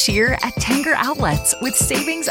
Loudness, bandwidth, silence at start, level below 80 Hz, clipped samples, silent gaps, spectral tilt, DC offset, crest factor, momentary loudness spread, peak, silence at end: -17 LUFS; 17 kHz; 0 s; -34 dBFS; under 0.1%; none; -3 dB/octave; under 0.1%; 16 dB; 3 LU; -2 dBFS; 0 s